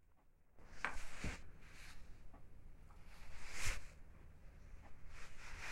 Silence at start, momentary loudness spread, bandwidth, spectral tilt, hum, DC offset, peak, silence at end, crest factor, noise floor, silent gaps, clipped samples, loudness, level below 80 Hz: 0 s; 18 LU; 13.5 kHz; -3 dB/octave; none; under 0.1%; -22 dBFS; 0 s; 24 dB; -68 dBFS; none; under 0.1%; -51 LUFS; -54 dBFS